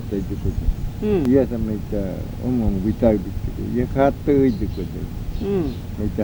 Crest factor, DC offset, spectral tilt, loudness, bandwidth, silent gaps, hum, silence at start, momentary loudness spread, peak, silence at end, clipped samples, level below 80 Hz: 18 dB; under 0.1%; -9 dB/octave; -22 LUFS; over 20 kHz; none; none; 0 s; 10 LU; -4 dBFS; 0 s; under 0.1%; -30 dBFS